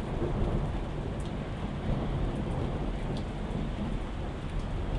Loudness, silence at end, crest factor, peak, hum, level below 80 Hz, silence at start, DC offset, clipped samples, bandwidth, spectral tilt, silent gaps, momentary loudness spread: -34 LUFS; 0 s; 14 dB; -18 dBFS; none; -36 dBFS; 0 s; under 0.1%; under 0.1%; 11 kHz; -7.5 dB/octave; none; 4 LU